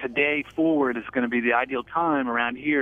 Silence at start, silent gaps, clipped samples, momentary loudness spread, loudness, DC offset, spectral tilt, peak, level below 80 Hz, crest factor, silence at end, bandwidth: 0 s; none; under 0.1%; 3 LU; -24 LUFS; under 0.1%; -7 dB/octave; -8 dBFS; -60 dBFS; 16 dB; 0 s; 3.8 kHz